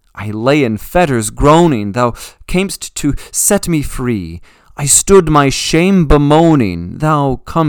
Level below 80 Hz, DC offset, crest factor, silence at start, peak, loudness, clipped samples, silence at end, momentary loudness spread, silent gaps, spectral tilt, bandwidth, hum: -26 dBFS; under 0.1%; 12 dB; 0.15 s; 0 dBFS; -12 LUFS; 0.6%; 0 s; 10 LU; none; -5 dB/octave; 19.5 kHz; none